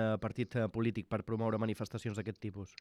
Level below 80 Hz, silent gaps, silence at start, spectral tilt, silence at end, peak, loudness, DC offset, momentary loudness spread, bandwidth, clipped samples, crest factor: -66 dBFS; none; 0 s; -7.5 dB/octave; 0.1 s; -22 dBFS; -37 LUFS; under 0.1%; 7 LU; 12.5 kHz; under 0.1%; 14 dB